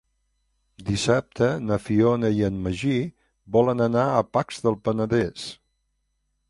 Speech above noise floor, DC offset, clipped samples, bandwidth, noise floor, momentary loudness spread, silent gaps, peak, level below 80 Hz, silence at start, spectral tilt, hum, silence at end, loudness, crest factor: 51 dB; under 0.1%; under 0.1%; 11.5 kHz; -73 dBFS; 8 LU; none; -6 dBFS; -50 dBFS; 0.8 s; -6.5 dB/octave; none; 0.95 s; -23 LUFS; 18 dB